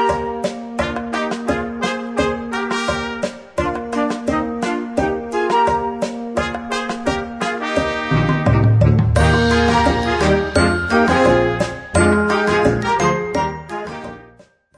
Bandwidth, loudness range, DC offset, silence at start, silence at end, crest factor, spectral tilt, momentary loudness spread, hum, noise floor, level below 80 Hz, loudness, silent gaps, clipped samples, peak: 11 kHz; 6 LU; under 0.1%; 0 s; 0.5 s; 16 dB; -6 dB/octave; 9 LU; none; -49 dBFS; -32 dBFS; -18 LUFS; none; under 0.1%; -2 dBFS